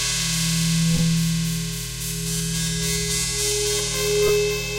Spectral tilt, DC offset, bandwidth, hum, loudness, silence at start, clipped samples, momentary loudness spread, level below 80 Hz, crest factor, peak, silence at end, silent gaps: -3.5 dB/octave; under 0.1%; 17 kHz; none; -21 LUFS; 0 s; under 0.1%; 6 LU; -36 dBFS; 14 dB; -8 dBFS; 0 s; none